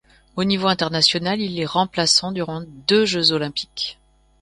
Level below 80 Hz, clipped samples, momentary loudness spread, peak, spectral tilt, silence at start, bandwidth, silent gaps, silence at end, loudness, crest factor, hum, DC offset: -54 dBFS; under 0.1%; 11 LU; 0 dBFS; -3.5 dB/octave; 0.35 s; 11.5 kHz; none; 0.5 s; -19 LUFS; 20 dB; none; under 0.1%